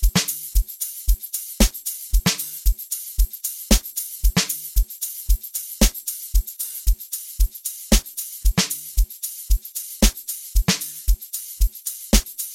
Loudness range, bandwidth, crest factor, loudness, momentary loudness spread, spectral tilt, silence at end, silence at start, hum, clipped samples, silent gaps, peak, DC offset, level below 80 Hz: 1 LU; 16.5 kHz; 20 dB; -23 LUFS; 8 LU; -3 dB/octave; 0 s; 0 s; none; under 0.1%; none; -2 dBFS; under 0.1%; -24 dBFS